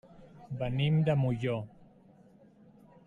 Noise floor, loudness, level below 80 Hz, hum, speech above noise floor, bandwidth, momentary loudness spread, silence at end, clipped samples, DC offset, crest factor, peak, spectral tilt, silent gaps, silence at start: -59 dBFS; -31 LUFS; -56 dBFS; none; 30 dB; 7 kHz; 14 LU; 1.4 s; under 0.1%; under 0.1%; 16 dB; -16 dBFS; -9 dB/octave; none; 0.15 s